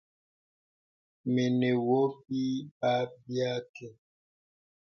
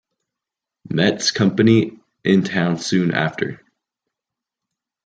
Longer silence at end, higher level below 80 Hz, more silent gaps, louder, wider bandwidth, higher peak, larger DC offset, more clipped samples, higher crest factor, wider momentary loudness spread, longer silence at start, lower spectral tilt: second, 0.95 s vs 1.5 s; second, -76 dBFS vs -60 dBFS; first, 2.71-2.81 s, 3.69-3.74 s vs none; second, -30 LUFS vs -19 LUFS; second, 6.8 kHz vs 9.2 kHz; second, -16 dBFS vs -2 dBFS; neither; neither; about the same, 16 dB vs 18 dB; first, 14 LU vs 11 LU; first, 1.25 s vs 0.9 s; first, -7 dB/octave vs -5.5 dB/octave